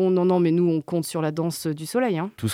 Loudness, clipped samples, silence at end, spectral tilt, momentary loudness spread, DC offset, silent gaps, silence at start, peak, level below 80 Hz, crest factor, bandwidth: -23 LUFS; under 0.1%; 0 s; -6.5 dB/octave; 7 LU; under 0.1%; none; 0 s; -10 dBFS; -66 dBFS; 12 dB; 16 kHz